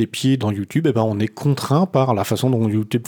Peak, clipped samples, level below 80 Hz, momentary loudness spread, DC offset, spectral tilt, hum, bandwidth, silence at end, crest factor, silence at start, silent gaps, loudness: -4 dBFS; under 0.1%; -60 dBFS; 4 LU; under 0.1%; -6.5 dB/octave; none; over 20 kHz; 0 s; 16 dB; 0 s; none; -19 LUFS